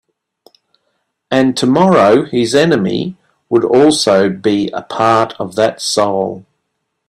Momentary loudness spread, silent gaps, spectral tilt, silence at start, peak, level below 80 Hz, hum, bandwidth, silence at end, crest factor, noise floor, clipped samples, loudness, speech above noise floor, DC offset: 9 LU; none; -5 dB/octave; 1.3 s; 0 dBFS; -54 dBFS; none; 13.5 kHz; 0.65 s; 14 dB; -71 dBFS; under 0.1%; -13 LUFS; 59 dB; under 0.1%